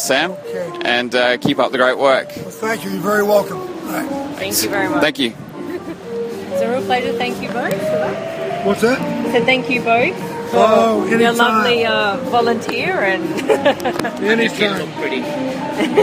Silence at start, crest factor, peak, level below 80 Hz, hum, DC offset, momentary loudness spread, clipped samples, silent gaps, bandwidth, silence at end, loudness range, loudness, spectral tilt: 0 s; 16 dB; 0 dBFS; -56 dBFS; none; under 0.1%; 11 LU; under 0.1%; none; 15.5 kHz; 0 s; 5 LU; -17 LUFS; -4 dB/octave